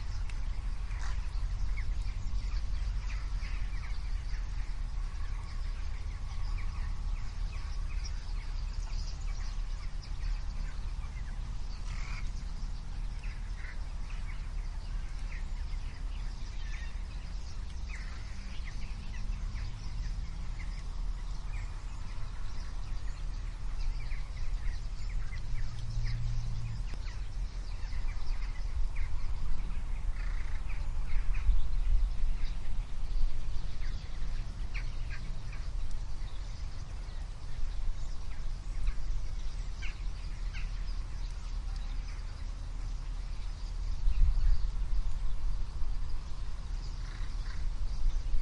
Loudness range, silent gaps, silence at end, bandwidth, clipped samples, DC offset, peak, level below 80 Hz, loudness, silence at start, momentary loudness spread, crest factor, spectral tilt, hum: 5 LU; none; 0 s; 8.4 kHz; under 0.1%; under 0.1%; -14 dBFS; -34 dBFS; -41 LUFS; 0 s; 5 LU; 18 dB; -5 dB/octave; none